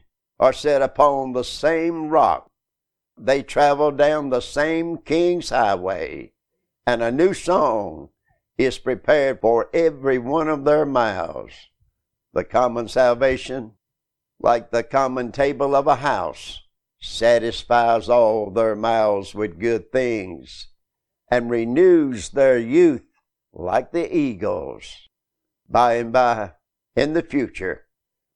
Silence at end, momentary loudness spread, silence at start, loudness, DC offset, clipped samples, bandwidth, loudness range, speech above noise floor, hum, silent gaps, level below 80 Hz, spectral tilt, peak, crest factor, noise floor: 0.6 s; 14 LU; 0.4 s; -20 LUFS; under 0.1%; under 0.1%; 11 kHz; 3 LU; 65 dB; none; none; -48 dBFS; -5.5 dB/octave; -2 dBFS; 18 dB; -84 dBFS